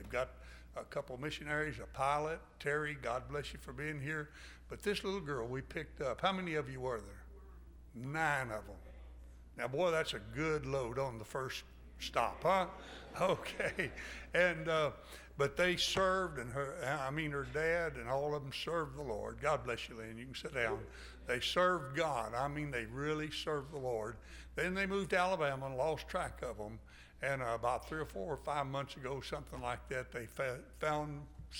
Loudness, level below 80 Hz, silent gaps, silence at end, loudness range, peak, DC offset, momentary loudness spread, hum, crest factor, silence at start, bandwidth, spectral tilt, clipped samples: -38 LUFS; -56 dBFS; none; 0 s; 5 LU; -18 dBFS; under 0.1%; 15 LU; none; 20 dB; 0 s; 17 kHz; -4.5 dB/octave; under 0.1%